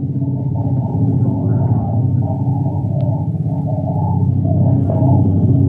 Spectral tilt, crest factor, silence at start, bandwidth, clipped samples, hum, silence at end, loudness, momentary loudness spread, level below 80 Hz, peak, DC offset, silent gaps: -13.5 dB/octave; 12 dB; 0 s; 1.6 kHz; under 0.1%; none; 0 s; -16 LUFS; 6 LU; -38 dBFS; -2 dBFS; under 0.1%; none